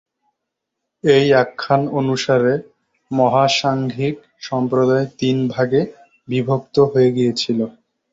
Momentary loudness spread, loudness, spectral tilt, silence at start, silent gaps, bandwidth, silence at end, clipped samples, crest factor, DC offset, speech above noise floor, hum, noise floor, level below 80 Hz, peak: 10 LU; -18 LUFS; -6 dB/octave; 1.05 s; none; 7.8 kHz; 0.4 s; under 0.1%; 16 dB; under 0.1%; 62 dB; none; -79 dBFS; -56 dBFS; -2 dBFS